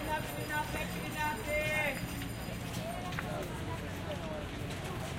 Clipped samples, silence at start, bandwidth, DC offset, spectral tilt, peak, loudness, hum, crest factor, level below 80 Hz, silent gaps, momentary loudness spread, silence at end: under 0.1%; 0 s; 16 kHz; under 0.1%; -4.5 dB/octave; -20 dBFS; -37 LUFS; none; 18 dB; -50 dBFS; none; 8 LU; 0 s